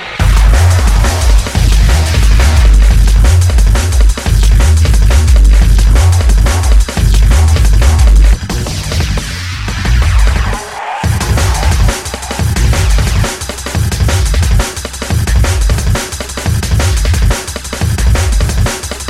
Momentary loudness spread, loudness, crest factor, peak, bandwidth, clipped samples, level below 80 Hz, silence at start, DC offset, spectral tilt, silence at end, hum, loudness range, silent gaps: 8 LU; -11 LUFS; 8 dB; 0 dBFS; 14.5 kHz; 0.3%; -10 dBFS; 0 s; under 0.1%; -4.5 dB/octave; 0 s; none; 4 LU; none